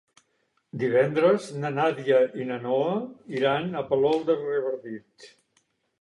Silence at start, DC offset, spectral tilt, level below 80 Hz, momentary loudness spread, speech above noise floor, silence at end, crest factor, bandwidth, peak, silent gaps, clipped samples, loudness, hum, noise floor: 0.75 s; under 0.1%; -6.5 dB/octave; -70 dBFS; 11 LU; 47 dB; 0.75 s; 18 dB; 11.5 kHz; -8 dBFS; none; under 0.1%; -25 LUFS; none; -72 dBFS